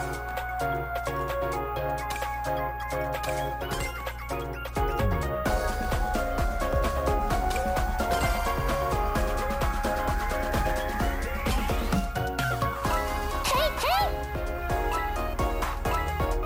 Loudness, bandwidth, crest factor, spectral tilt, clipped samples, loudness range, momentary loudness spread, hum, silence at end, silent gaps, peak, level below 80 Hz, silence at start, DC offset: -29 LUFS; 16 kHz; 16 dB; -5 dB/octave; under 0.1%; 3 LU; 5 LU; 60 Hz at -40 dBFS; 0 s; none; -12 dBFS; -32 dBFS; 0 s; under 0.1%